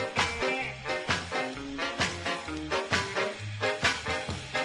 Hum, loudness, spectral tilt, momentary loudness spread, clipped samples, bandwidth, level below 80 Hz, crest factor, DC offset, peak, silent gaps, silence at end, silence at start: none; -30 LUFS; -3 dB/octave; 6 LU; under 0.1%; 12 kHz; -52 dBFS; 20 dB; under 0.1%; -10 dBFS; none; 0 s; 0 s